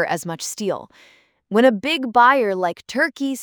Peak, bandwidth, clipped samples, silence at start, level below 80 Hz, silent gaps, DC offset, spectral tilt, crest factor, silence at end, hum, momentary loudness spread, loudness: -2 dBFS; over 20 kHz; under 0.1%; 0 s; -68 dBFS; none; under 0.1%; -4 dB/octave; 18 dB; 0 s; none; 12 LU; -19 LUFS